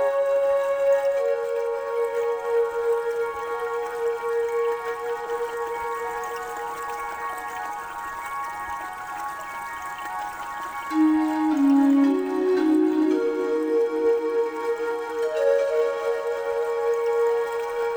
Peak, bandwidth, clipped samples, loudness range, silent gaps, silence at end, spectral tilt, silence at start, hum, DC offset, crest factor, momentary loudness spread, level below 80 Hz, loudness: -10 dBFS; over 20 kHz; under 0.1%; 10 LU; none; 0 s; -4.5 dB/octave; 0 s; none; under 0.1%; 14 dB; 11 LU; -62 dBFS; -25 LUFS